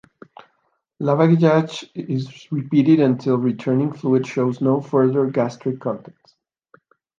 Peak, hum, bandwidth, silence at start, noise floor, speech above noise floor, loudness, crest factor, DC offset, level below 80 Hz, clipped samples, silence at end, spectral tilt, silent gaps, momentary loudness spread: -2 dBFS; none; 7.4 kHz; 1 s; -69 dBFS; 50 dB; -19 LUFS; 18 dB; under 0.1%; -68 dBFS; under 0.1%; 1.2 s; -8.5 dB/octave; none; 12 LU